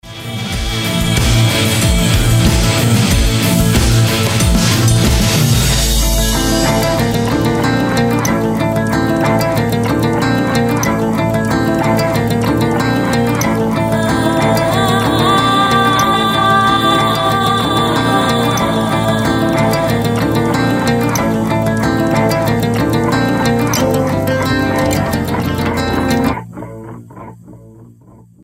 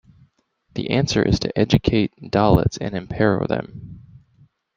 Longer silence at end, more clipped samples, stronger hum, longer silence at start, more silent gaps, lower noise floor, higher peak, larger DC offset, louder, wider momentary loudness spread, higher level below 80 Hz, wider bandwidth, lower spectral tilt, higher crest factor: second, 0.6 s vs 0.8 s; neither; neither; second, 0.05 s vs 0.75 s; neither; second, -42 dBFS vs -62 dBFS; about the same, 0 dBFS vs -2 dBFS; neither; first, -13 LUFS vs -20 LUFS; second, 4 LU vs 15 LU; first, -24 dBFS vs -38 dBFS; first, 16.5 kHz vs 11 kHz; second, -5 dB/octave vs -6.5 dB/octave; second, 12 dB vs 20 dB